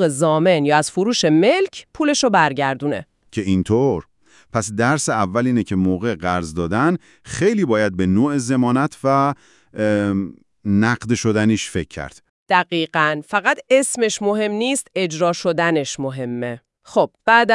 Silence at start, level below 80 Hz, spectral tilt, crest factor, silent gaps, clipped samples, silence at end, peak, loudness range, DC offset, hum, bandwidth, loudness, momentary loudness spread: 0 s; -54 dBFS; -5 dB/octave; 18 dB; 12.29-12.46 s; under 0.1%; 0 s; 0 dBFS; 2 LU; under 0.1%; none; 12 kHz; -19 LUFS; 10 LU